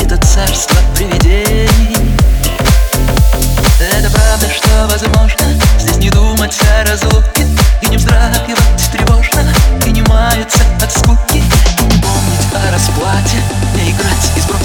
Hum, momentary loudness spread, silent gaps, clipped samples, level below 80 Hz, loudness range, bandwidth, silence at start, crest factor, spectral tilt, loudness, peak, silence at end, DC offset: none; 2 LU; none; under 0.1%; -10 dBFS; 1 LU; 20 kHz; 0 s; 8 dB; -4.5 dB/octave; -10 LUFS; 0 dBFS; 0 s; under 0.1%